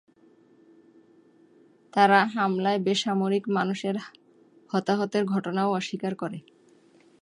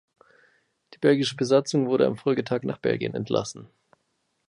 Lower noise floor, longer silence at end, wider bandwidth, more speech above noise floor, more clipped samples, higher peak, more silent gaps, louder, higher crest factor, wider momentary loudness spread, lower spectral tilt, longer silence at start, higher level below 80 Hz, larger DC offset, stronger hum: second, -59 dBFS vs -74 dBFS; about the same, 0.85 s vs 0.85 s; about the same, 11 kHz vs 11 kHz; second, 34 dB vs 50 dB; neither; about the same, -6 dBFS vs -8 dBFS; neither; about the same, -26 LUFS vs -24 LUFS; about the same, 22 dB vs 18 dB; first, 13 LU vs 7 LU; about the same, -5.5 dB/octave vs -5.5 dB/octave; first, 1.95 s vs 1 s; second, -78 dBFS vs -66 dBFS; neither; neither